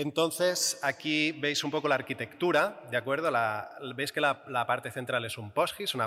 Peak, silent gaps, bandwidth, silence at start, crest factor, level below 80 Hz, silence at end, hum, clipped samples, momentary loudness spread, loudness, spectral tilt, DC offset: -14 dBFS; none; 16 kHz; 0 s; 16 dB; -78 dBFS; 0 s; none; under 0.1%; 7 LU; -29 LUFS; -3 dB/octave; under 0.1%